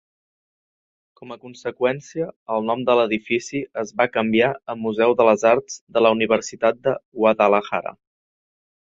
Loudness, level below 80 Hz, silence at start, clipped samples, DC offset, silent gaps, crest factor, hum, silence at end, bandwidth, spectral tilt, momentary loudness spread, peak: -20 LUFS; -64 dBFS; 1.2 s; under 0.1%; under 0.1%; 2.36-2.46 s, 5.81-5.87 s, 7.05-7.12 s; 20 dB; none; 1.1 s; 7.8 kHz; -5 dB/octave; 13 LU; -2 dBFS